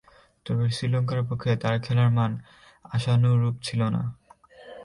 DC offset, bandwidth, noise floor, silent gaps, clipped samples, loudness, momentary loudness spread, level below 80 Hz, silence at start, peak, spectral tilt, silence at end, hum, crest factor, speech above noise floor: under 0.1%; 11 kHz; -50 dBFS; none; under 0.1%; -25 LUFS; 11 LU; -56 dBFS; 0.45 s; -12 dBFS; -7 dB/octave; 0 s; none; 14 dB; 26 dB